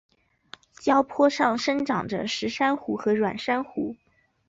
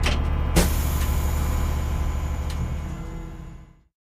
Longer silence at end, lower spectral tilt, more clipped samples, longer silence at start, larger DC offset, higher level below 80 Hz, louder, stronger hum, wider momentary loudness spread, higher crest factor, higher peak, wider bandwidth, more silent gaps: first, 0.55 s vs 0.4 s; about the same, -4.5 dB/octave vs -5 dB/octave; neither; first, 0.8 s vs 0 s; neither; second, -64 dBFS vs -26 dBFS; about the same, -25 LUFS vs -26 LUFS; neither; second, 8 LU vs 15 LU; about the same, 18 dB vs 20 dB; second, -8 dBFS vs -4 dBFS; second, 8 kHz vs 15.5 kHz; neither